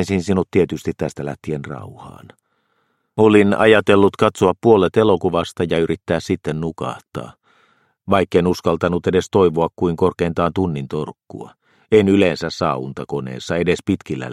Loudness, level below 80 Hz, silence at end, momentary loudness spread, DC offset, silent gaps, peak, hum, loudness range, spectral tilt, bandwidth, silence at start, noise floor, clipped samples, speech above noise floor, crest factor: -18 LUFS; -48 dBFS; 0 s; 15 LU; under 0.1%; none; 0 dBFS; none; 6 LU; -6.5 dB/octave; 12.5 kHz; 0 s; -67 dBFS; under 0.1%; 49 dB; 18 dB